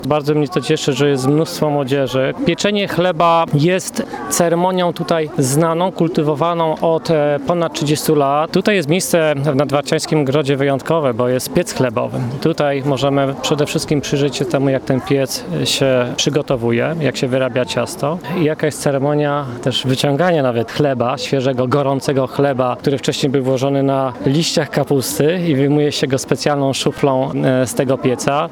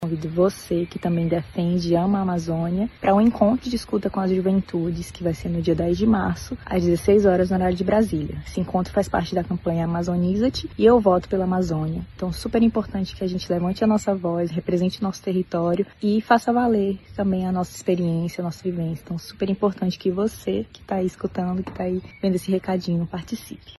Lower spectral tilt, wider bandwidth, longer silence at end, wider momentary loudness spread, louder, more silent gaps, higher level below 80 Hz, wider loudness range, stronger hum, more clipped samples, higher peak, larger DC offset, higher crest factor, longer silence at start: second, -5 dB/octave vs -7.5 dB/octave; first, 20 kHz vs 12.5 kHz; about the same, 0 s vs 0.05 s; second, 4 LU vs 9 LU; first, -16 LUFS vs -23 LUFS; neither; second, -50 dBFS vs -44 dBFS; about the same, 2 LU vs 4 LU; neither; neither; first, 0 dBFS vs -4 dBFS; neither; about the same, 14 dB vs 18 dB; about the same, 0 s vs 0 s